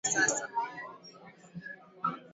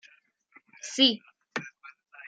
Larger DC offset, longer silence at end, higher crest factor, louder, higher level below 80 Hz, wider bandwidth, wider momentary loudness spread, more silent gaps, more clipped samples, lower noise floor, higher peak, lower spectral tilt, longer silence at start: neither; about the same, 0 s vs 0 s; about the same, 20 dB vs 24 dB; second, -32 LUFS vs -26 LUFS; first, -76 dBFS vs -88 dBFS; second, 8 kHz vs 9.2 kHz; first, 23 LU vs 20 LU; neither; neither; second, -53 dBFS vs -63 dBFS; second, -14 dBFS vs -8 dBFS; about the same, -1.5 dB/octave vs -2 dB/octave; second, 0.05 s vs 0.85 s